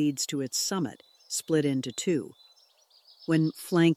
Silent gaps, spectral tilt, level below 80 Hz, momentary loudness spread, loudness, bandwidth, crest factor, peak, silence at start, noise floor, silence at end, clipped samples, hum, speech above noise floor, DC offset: none; -4.5 dB/octave; -76 dBFS; 8 LU; -29 LUFS; 15 kHz; 16 dB; -12 dBFS; 0 s; -62 dBFS; 0 s; under 0.1%; none; 35 dB; under 0.1%